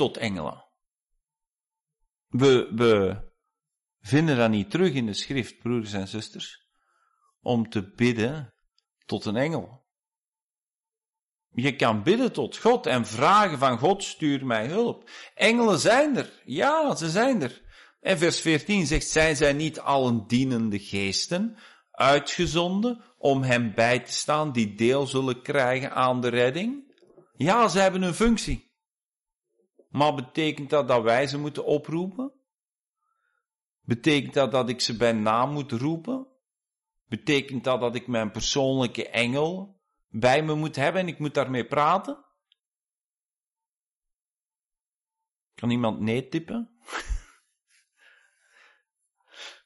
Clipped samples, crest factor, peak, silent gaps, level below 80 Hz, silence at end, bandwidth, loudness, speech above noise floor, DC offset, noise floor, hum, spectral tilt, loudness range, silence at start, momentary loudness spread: under 0.1%; 18 dB; -8 dBFS; 10.28-10.32 s, 43.05-43.09 s; -48 dBFS; 0.15 s; 11.5 kHz; -25 LUFS; over 66 dB; under 0.1%; under -90 dBFS; none; -5 dB/octave; 8 LU; 0 s; 13 LU